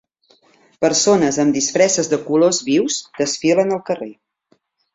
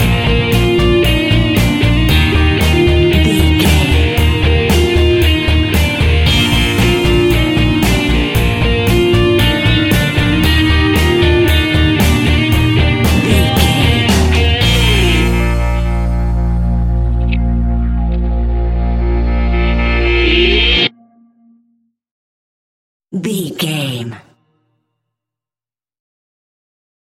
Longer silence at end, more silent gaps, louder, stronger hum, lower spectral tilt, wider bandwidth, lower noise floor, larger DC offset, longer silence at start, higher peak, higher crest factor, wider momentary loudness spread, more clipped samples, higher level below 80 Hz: second, 0.8 s vs 2.95 s; second, none vs 22.11-23.00 s; second, -17 LUFS vs -12 LUFS; neither; second, -3.5 dB/octave vs -5.5 dB/octave; second, 8.2 kHz vs 17 kHz; second, -62 dBFS vs under -90 dBFS; second, under 0.1% vs 0.3%; first, 0.8 s vs 0 s; about the same, -2 dBFS vs 0 dBFS; about the same, 16 dB vs 12 dB; about the same, 8 LU vs 6 LU; neither; second, -60 dBFS vs -16 dBFS